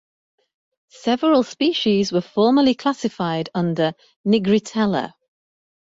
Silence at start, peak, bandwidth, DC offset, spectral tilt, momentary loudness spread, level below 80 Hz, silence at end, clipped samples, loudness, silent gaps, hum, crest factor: 1.05 s; -6 dBFS; 7.8 kHz; under 0.1%; -6 dB/octave; 7 LU; -60 dBFS; 0.85 s; under 0.1%; -20 LUFS; 4.16-4.24 s; none; 16 dB